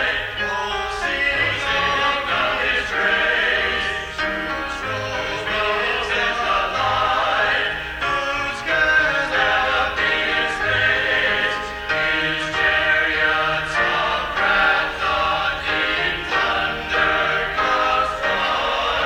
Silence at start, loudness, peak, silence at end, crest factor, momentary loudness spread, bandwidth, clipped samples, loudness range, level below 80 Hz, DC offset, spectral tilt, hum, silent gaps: 0 s; -19 LUFS; -6 dBFS; 0 s; 14 dB; 6 LU; 17.5 kHz; under 0.1%; 2 LU; -40 dBFS; under 0.1%; -3 dB/octave; none; none